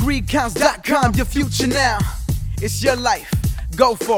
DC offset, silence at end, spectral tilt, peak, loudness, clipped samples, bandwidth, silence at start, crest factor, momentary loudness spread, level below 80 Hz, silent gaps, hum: under 0.1%; 0 s; -4.5 dB/octave; 0 dBFS; -19 LUFS; under 0.1%; over 20 kHz; 0 s; 18 dB; 7 LU; -28 dBFS; none; none